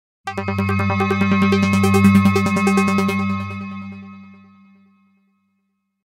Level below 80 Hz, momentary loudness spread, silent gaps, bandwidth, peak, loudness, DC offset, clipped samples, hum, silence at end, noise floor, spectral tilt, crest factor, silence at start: -56 dBFS; 17 LU; none; 15.5 kHz; -2 dBFS; -17 LUFS; under 0.1%; under 0.1%; none; 1.75 s; -71 dBFS; -6.5 dB/octave; 16 dB; 0.25 s